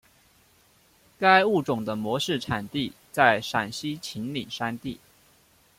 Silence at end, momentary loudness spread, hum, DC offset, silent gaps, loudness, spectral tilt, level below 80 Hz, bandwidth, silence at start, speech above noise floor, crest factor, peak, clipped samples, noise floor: 0.85 s; 13 LU; none; under 0.1%; none; -25 LUFS; -4.5 dB/octave; -62 dBFS; 16.5 kHz; 1.2 s; 36 dB; 22 dB; -4 dBFS; under 0.1%; -61 dBFS